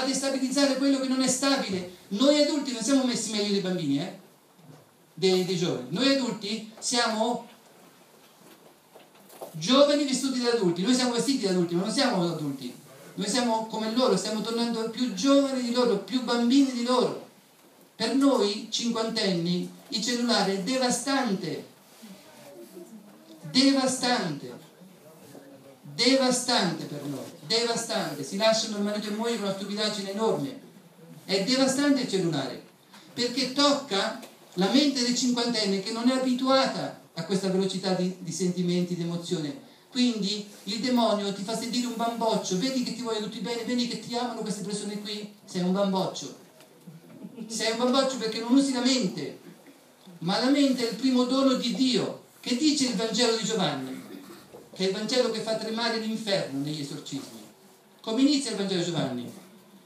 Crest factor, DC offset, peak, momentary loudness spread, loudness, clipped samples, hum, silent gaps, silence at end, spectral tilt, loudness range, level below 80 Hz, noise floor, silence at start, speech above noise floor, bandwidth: 20 dB; under 0.1%; -8 dBFS; 14 LU; -26 LUFS; under 0.1%; none; none; 0.1 s; -4 dB/octave; 4 LU; -82 dBFS; -56 dBFS; 0 s; 30 dB; 15.5 kHz